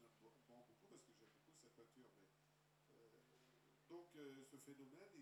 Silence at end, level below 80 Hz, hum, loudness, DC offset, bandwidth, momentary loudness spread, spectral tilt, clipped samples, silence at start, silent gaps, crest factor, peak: 0 s; under -90 dBFS; none; -64 LUFS; under 0.1%; 13 kHz; 8 LU; -4.5 dB/octave; under 0.1%; 0 s; none; 18 dB; -50 dBFS